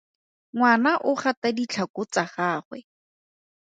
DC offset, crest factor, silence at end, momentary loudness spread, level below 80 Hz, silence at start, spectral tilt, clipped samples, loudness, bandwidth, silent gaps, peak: under 0.1%; 20 dB; 0.8 s; 14 LU; -74 dBFS; 0.55 s; -4.5 dB/octave; under 0.1%; -24 LUFS; 9.2 kHz; 1.37-1.42 s, 1.90-1.94 s, 2.65-2.71 s; -6 dBFS